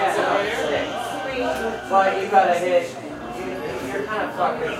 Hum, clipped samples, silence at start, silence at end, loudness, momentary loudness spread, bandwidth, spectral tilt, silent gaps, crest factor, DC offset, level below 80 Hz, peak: none; under 0.1%; 0 s; 0 s; -22 LUFS; 12 LU; 15.5 kHz; -4 dB/octave; none; 20 dB; under 0.1%; -52 dBFS; -2 dBFS